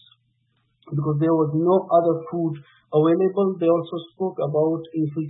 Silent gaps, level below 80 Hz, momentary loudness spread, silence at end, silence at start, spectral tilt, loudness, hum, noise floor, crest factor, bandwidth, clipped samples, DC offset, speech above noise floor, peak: none; -68 dBFS; 10 LU; 0 s; 0.85 s; -13 dB/octave; -22 LUFS; none; -68 dBFS; 16 dB; 4 kHz; under 0.1%; under 0.1%; 47 dB; -6 dBFS